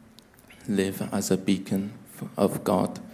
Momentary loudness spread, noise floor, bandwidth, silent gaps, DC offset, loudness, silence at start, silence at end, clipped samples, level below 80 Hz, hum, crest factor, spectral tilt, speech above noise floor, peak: 12 LU; -53 dBFS; 16 kHz; none; under 0.1%; -27 LUFS; 0.5 s; 0 s; under 0.1%; -58 dBFS; none; 18 dB; -5.5 dB/octave; 27 dB; -8 dBFS